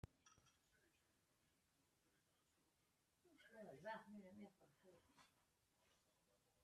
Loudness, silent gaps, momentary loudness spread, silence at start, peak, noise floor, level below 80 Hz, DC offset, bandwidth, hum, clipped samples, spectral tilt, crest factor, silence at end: -60 LUFS; none; 11 LU; 0.05 s; -40 dBFS; -85 dBFS; -86 dBFS; under 0.1%; 13 kHz; none; under 0.1%; -5 dB/octave; 26 dB; 0 s